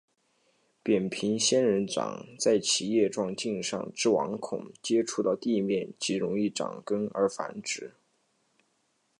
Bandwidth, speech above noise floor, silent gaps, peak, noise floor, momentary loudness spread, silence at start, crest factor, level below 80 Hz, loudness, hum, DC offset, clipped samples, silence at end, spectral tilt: 11 kHz; 45 dB; none; -12 dBFS; -73 dBFS; 10 LU; 0.85 s; 18 dB; -72 dBFS; -29 LUFS; none; under 0.1%; under 0.1%; 1.3 s; -3.5 dB/octave